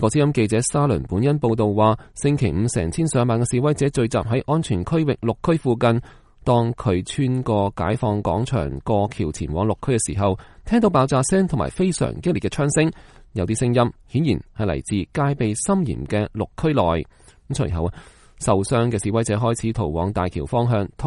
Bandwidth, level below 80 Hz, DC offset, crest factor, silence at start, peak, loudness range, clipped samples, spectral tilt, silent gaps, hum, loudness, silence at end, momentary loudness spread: 11.5 kHz; -40 dBFS; under 0.1%; 18 dB; 0 s; -4 dBFS; 3 LU; under 0.1%; -6.5 dB/octave; none; none; -21 LUFS; 0 s; 6 LU